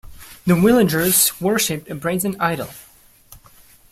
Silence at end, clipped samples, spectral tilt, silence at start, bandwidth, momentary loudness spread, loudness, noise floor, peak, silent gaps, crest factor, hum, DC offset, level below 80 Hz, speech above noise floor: 0.55 s; under 0.1%; -4 dB/octave; 0.05 s; 16 kHz; 12 LU; -18 LUFS; -49 dBFS; -2 dBFS; none; 18 dB; none; under 0.1%; -48 dBFS; 31 dB